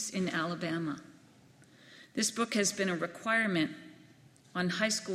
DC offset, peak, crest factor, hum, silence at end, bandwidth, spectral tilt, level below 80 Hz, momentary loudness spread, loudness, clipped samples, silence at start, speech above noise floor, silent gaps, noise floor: under 0.1%; -14 dBFS; 20 dB; none; 0 s; 15.5 kHz; -3.5 dB/octave; -74 dBFS; 11 LU; -32 LUFS; under 0.1%; 0 s; 27 dB; none; -60 dBFS